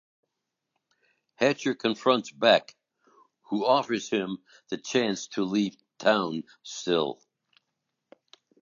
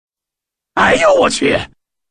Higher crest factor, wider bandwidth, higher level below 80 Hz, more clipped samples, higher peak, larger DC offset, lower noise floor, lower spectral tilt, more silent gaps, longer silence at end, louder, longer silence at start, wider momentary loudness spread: first, 24 dB vs 16 dB; second, 7.6 kHz vs 10.5 kHz; second, -76 dBFS vs -42 dBFS; neither; second, -4 dBFS vs 0 dBFS; neither; about the same, -84 dBFS vs -85 dBFS; about the same, -4 dB/octave vs -3.5 dB/octave; neither; first, 1.5 s vs 0.45 s; second, -27 LUFS vs -13 LUFS; first, 1.4 s vs 0.75 s; about the same, 13 LU vs 12 LU